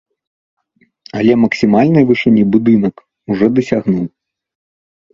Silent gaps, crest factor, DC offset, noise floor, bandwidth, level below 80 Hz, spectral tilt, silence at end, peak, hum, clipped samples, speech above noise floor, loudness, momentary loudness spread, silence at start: none; 14 dB; under 0.1%; -45 dBFS; 7.4 kHz; -50 dBFS; -8 dB/octave; 1.05 s; 0 dBFS; none; under 0.1%; 34 dB; -13 LUFS; 10 LU; 1.15 s